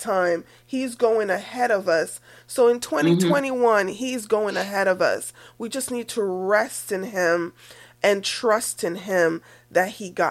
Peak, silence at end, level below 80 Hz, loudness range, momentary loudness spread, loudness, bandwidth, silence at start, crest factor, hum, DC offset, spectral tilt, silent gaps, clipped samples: -6 dBFS; 0 s; -68 dBFS; 3 LU; 10 LU; -23 LUFS; 15.5 kHz; 0 s; 16 dB; none; under 0.1%; -4 dB/octave; none; under 0.1%